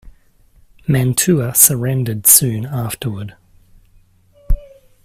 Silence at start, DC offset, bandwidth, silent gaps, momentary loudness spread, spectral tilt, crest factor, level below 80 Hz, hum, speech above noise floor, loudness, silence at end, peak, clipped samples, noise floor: 0.05 s; under 0.1%; 16 kHz; none; 17 LU; -4 dB/octave; 18 dB; -30 dBFS; none; 36 dB; -13 LUFS; 0.4 s; 0 dBFS; 0.1%; -51 dBFS